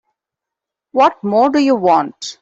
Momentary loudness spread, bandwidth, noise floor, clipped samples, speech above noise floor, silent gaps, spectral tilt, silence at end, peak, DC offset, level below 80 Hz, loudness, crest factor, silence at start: 7 LU; 8 kHz; -84 dBFS; under 0.1%; 70 dB; none; -5 dB/octave; 0.1 s; -2 dBFS; under 0.1%; -62 dBFS; -14 LUFS; 14 dB; 0.95 s